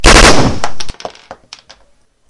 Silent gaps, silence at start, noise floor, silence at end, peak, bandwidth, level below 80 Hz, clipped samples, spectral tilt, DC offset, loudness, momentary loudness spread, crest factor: none; 0 s; -49 dBFS; 0.95 s; 0 dBFS; 12 kHz; -18 dBFS; 1%; -3 dB/octave; under 0.1%; -8 LUFS; 24 LU; 10 dB